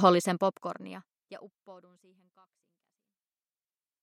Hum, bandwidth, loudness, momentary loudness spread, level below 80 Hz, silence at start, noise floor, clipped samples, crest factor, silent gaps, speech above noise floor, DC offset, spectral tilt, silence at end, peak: none; 15 kHz; -29 LUFS; 27 LU; under -90 dBFS; 0 s; under -90 dBFS; under 0.1%; 26 dB; none; over 59 dB; under 0.1%; -5.5 dB/octave; 2.3 s; -6 dBFS